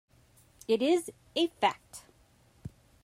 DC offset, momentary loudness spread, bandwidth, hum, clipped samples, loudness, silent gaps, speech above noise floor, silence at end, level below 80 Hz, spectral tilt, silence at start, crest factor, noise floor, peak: under 0.1%; 22 LU; 15.5 kHz; none; under 0.1%; -30 LUFS; none; 34 dB; 0.35 s; -66 dBFS; -4 dB/octave; 0.7 s; 20 dB; -64 dBFS; -12 dBFS